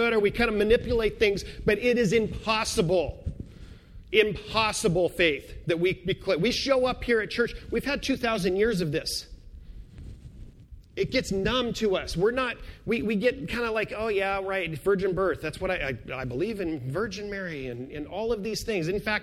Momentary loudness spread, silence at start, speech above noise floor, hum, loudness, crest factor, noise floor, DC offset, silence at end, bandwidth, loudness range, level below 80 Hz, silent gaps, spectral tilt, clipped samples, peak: 10 LU; 0 s; 22 dB; none; -27 LUFS; 20 dB; -48 dBFS; under 0.1%; 0 s; 15.5 kHz; 5 LU; -44 dBFS; none; -4.5 dB/octave; under 0.1%; -8 dBFS